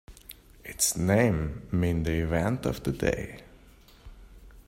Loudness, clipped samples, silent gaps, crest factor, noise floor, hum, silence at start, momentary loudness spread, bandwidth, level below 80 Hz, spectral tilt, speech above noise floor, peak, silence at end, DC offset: -27 LUFS; under 0.1%; none; 20 dB; -54 dBFS; none; 0.1 s; 23 LU; 16 kHz; -44 dBFS; -5 dB/octave; 27 dB; -10 dBFS; 0.05 s; under 0.1%